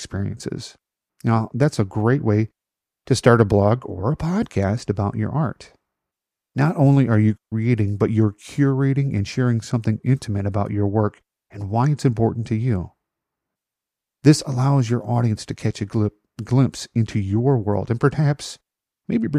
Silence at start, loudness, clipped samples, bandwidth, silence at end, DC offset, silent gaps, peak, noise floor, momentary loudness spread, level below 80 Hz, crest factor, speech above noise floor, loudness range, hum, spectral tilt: 0 s; -21 LUFS; under 0.1%; 11 kHz; 0 s; under 0.1%; none; -2 dBFS; -87 dBFS; 10 LU; -50 dBFS; 20 dB; 67 dB; 3 LU; none; -7.5 dB/octave